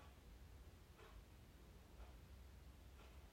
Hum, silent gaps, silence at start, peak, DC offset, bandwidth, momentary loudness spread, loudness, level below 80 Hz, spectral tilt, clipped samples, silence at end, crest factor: none; none; 0 s; -50 dBFS; under 0.1%; 16 kHz; 2 LU; -64 LUFS; -64 dBFS; -5 dB/octave; under 0.1%; 0 s; 12 dB